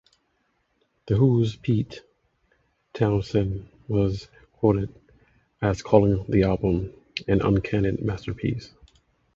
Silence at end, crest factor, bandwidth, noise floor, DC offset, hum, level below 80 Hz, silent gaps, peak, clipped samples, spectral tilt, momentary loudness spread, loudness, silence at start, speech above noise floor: 0.7 s; 22 dB; 7.6 kHz; -71 dBFS; under 0.1%; none; -42 dBFS; none; -2 dBFS; under 0.1%; -8.5 dB/octave; 14 LU; -24 LUFS; 1.05 s; 48 dB